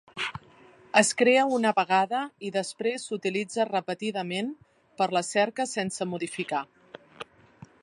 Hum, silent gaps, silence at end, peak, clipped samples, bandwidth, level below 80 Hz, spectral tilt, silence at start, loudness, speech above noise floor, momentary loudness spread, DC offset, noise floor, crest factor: none; none; 0.6 s; -4 dBFS; under 0.1%; 11.5 kHz; -72 dBFS; -3.5 dB/octave; 0.15 s; -27 LUFS; 28 dB; 13 LU; under 0.1%; -55 dBFS; 24 dB